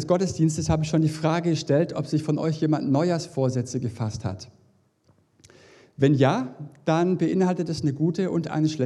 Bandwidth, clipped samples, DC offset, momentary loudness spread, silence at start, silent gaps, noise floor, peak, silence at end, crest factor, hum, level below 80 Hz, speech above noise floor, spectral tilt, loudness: 11.5 kHz; under 0.1%; under 0.1%; 8 LU; 0 s; none; -63 dBFS; -6 dBFS; 0 s; 18 dB; none; -54 dBFS; 40 dB; -7 dB/octave; -24 LUFS